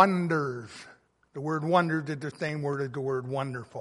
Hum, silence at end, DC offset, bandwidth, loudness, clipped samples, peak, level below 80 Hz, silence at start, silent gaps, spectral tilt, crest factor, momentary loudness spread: none; 0 s; under 0.1%; 11.5 kHz; -30 LUFS; under 0.1%; -6 dBFS; -72 dBFS; 0 s; none; -7 dB/octave; 24 dB; 14 LU